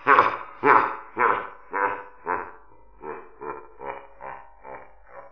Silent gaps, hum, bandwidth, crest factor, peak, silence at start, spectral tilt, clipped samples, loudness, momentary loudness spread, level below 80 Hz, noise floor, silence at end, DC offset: none; none; 5.4 kHz; 24 dB; -2 dBFS; 0 s; -6 dB/octave; under 0.1%; -23 LUFS; 24 LU; -62 dBFS; -52 dBFS; 0.1 s; 0.4%